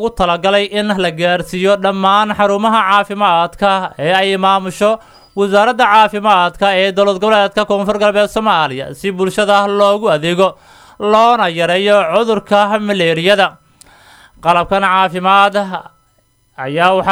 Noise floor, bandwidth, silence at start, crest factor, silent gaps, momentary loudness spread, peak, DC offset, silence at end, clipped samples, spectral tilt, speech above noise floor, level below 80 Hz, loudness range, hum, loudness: -56 dBFS; 15.5 kHz; 0 s; 12 dB; none; 6 LU; 0 dBFS; under 0.1%; 0 s; under 0.1%; -4.5 dB/octave; 44 dB; -44 dBFS; 2 LU; none; -12 LUFS